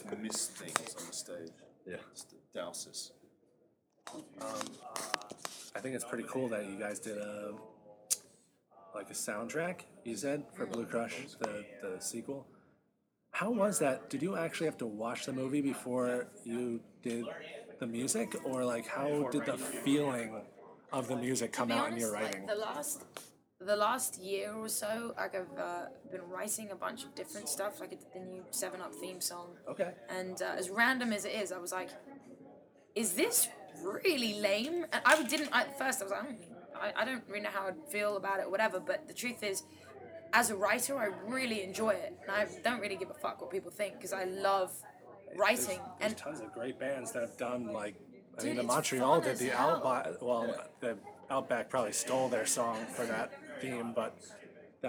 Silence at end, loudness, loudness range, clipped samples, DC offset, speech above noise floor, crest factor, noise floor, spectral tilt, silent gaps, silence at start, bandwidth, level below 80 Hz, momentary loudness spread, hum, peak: 0 s; -36 LUFS; 8 LU; under 0.1%; under 0.1%; 41 dB; 30 dB; -77 dBFS; -3 dB/octave; none; 0 s; over 20 kHz; -82 dBFS; 16 LU; none; -8 dBFS